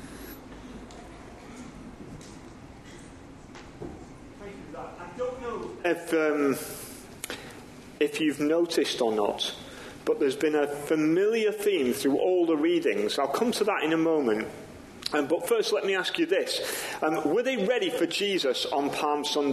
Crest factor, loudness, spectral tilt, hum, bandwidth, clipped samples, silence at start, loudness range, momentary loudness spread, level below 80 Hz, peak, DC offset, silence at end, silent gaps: 18 dB; -27 LUFS; -4 dB/octave; none; 13 kHz; under 0.1%; 0 s; 19 LU; 21 LU; -58 dBFS; -10 dBFS; under 0.1%; 0 s; none